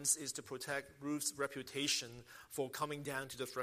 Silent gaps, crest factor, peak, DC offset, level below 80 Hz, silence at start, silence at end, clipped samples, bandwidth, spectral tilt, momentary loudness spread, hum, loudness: none; 22 dB; -20 dBFS; under 0.1%; -76 dBFS; 0 s; 0 s; under 0.1%; 15.5 kHz; -2 dB/octave; 9 LU; none; -40 LUFS